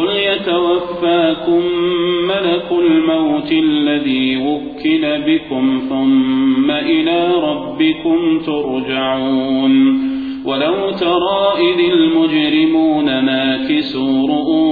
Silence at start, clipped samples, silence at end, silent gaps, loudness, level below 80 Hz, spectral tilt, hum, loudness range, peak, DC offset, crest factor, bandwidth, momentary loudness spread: 0 s; under 0.1%; 0 s; none; -15 LUFS; -50 dBFS; -8 dB/octave; none; 2 LU; -2 dBFS; under 0.1%; 12 dB; 4.9 kHz; 5 LU